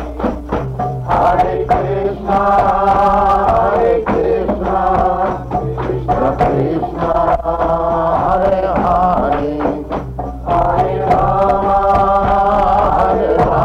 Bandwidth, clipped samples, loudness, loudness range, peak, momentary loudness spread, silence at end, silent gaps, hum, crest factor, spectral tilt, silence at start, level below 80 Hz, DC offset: 9 kHz; under 0.1%; -14 LUFS; 3 LU; -4 dBFS; 8 LU; 0 s; none; none; 10 dB; -8.5 dB/octave; 0 s; -28 dBFS; under 0.1%